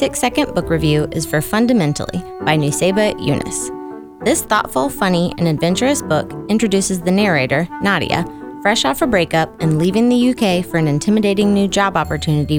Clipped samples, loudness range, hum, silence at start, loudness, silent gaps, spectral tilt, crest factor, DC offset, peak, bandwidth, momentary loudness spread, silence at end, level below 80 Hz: under 0.1%; 2 LU; none; 0 s; -16 LUFS; none; -5 dB/octave; 16 dB; under 0.1%; 0 dBFS; 19 kHz; 5 LU; 0 s; -40 dBFS